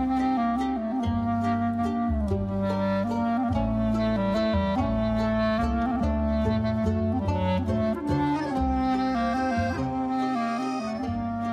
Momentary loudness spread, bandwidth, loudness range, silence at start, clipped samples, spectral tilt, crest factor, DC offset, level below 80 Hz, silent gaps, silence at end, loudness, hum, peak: 3 LU; 9.6 kHz; 1 LU; 0 s; under 0.1%; -8 dB/octave; 12 dB; under 0.1%; -38 dBFS; none; 0 s; -26 LUFS; none; -12 dBFS